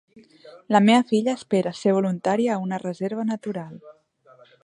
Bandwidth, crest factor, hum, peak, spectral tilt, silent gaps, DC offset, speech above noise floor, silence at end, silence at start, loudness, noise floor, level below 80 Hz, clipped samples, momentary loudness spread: 10.5 kHz; 20 dB; none; -4 dBFS; -6 dB/octave; none; under 0.1%; 32 dB; 0.75 s; 0.45 s; -22 LUFS; -54 dBFS; -72 dBFS; under 0.1%; 12 LU